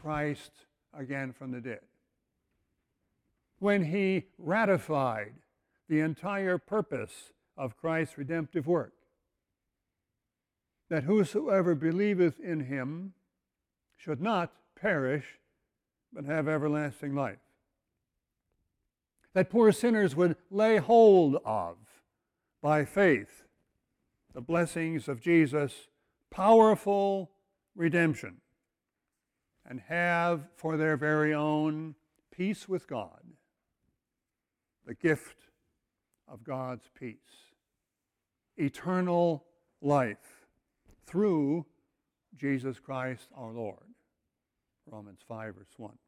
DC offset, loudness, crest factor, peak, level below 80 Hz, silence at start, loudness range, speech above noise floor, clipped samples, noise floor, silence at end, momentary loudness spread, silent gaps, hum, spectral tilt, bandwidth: under 0.1%; -29 LUFS; 22 dB; -10 dBFS; -70 dBFS; 0.05 s; 12 LU; 59 dB; under 0.1%; -88 dBFS; 0.2 s; 20 LU; none; none; -7 dB/octave; 15 kHz